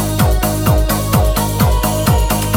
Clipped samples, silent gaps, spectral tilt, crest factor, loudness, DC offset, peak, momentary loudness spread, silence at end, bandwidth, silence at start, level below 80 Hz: under 0.1%; none; -5 dB/octave; 12 dB; -14 LUFS; under 0.1%; 0 dBFS; 1 LU; 0 s; 17 kHz; 0 s; -18 dBFS